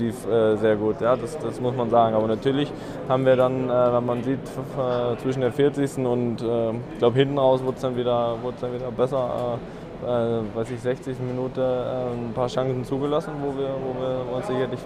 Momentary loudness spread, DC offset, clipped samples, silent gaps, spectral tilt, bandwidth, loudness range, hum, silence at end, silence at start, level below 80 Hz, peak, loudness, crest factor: 9 LU; under 0.1%; under 0.1%; none; -7.5 dB/octave; 14 kHz; 4 LU; none; 0 s; 0 s; -50 dBFS; -6 dBFS; -24 LUFS; 18 dB